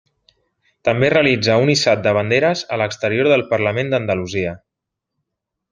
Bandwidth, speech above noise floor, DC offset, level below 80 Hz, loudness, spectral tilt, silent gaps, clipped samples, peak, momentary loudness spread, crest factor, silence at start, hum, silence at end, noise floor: 9.8 kHz; 64 dB; under 0.1%; -56 dBFS; -17 LUFS; -5 dB/octave; none; under 0.1%; -2 dBFS; 8 LU; 18 dB; 0.85 s; none; 1.15 s; -81 dBFS